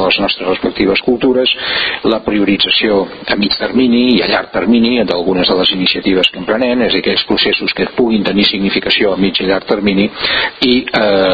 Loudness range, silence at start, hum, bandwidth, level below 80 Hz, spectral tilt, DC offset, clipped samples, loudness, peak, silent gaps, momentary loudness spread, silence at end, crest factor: 1 LU; 0 s; none; 7.6 kHz; -42 dBFS; -6.5 dB/octave; under 0.1%; under 0.1%; -12 LUFS; 0 dBFS; none; 4 LU; 0 s; 12 dB